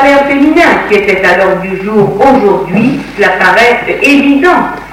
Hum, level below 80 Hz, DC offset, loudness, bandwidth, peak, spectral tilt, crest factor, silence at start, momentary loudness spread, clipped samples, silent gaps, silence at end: none; -36 dBFS; under 0.1%; -7 LUFS; 16 kHz; 0 dBFS; -5.5 dB/octave; 8 dB; 0 s; 5 LU; 3%; none; 0 s